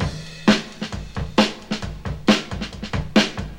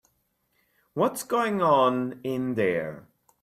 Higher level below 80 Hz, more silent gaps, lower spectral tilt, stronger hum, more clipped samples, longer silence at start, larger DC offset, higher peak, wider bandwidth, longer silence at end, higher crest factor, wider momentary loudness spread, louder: first, -36 dBFS vs -70 dBFS; neither; about the same, -5 dB/octave vs -5.5 dB/octave; neither; neither; second, 0 s vs 0.95 s; neither; first, -2 dBFS vs -8 dBFS; second, 13.5 kHz vs 16 kHz; second, 0 s vs 0.4 s; about the same, 20 dB vs 18 dB; about the same, 11 LU vs 10 LU; first, -22 LUFS vs -25 LUFS